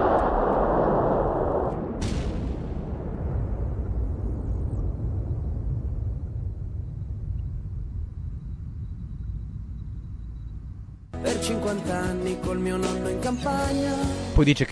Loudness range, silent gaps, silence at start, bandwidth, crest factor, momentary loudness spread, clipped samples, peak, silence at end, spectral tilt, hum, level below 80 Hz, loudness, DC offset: 9 LU; none; 0 s; 11 kHz; 22 dB; 14 LU; under 0.1%; -6 dBFS; 0 s; -6.5 dB/octave; none; -32 dBFS; -28 LUFS; under 0.1%